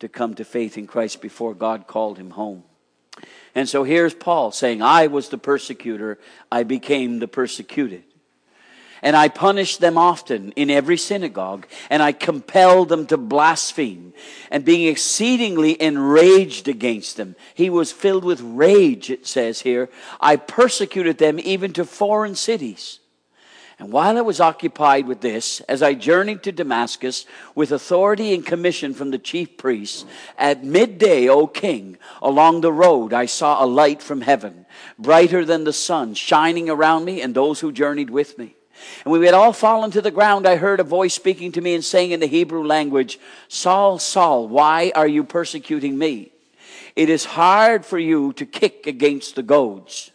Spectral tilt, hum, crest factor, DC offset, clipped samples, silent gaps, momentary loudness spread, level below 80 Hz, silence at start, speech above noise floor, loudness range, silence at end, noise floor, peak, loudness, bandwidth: -4 dB/octave; none; 18 dB; under 0.1%; under 0.1%; none; 13 LU; -80 dBFS; 0 s; 42 dB; 5 LU; 0.1 s; -59 dBFS; 0 dBFS; -17 LUFS; 10.5 kHz